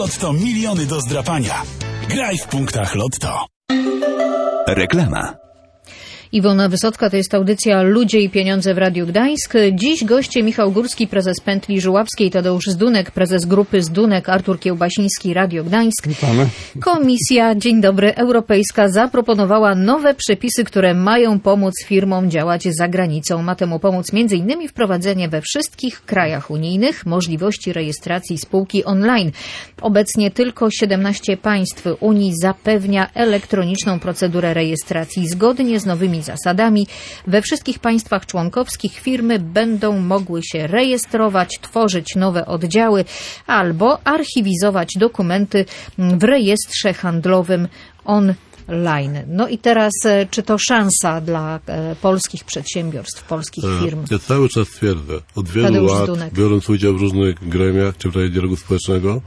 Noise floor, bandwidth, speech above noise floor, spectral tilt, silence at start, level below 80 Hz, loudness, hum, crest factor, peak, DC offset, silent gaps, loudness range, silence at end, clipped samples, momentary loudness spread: -45 dBFS; 11 kHz; 29 dB; -5 dB/octave; 0 s; -44 dBFS; -16 LUFS; none; 14 dB; -2 dBFS; under 0.1%; 3.56-3.61 s; 5 LU; 0 s; under 0.1%; 8 LU